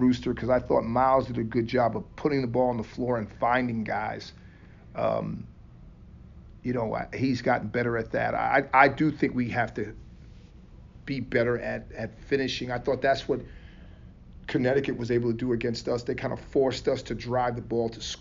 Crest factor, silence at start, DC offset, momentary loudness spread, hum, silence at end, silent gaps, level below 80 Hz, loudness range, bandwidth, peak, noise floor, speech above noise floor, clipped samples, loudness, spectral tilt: 24 dB; 0 s; under 0.1%; 12 LU; none; 0 s; none; -50 dBFS; 6 LU; 7.4 kHz; -4 dBFS; -49 dBFS; 22 dB; under 0.1%; -27 LUFS; -5 dB/octave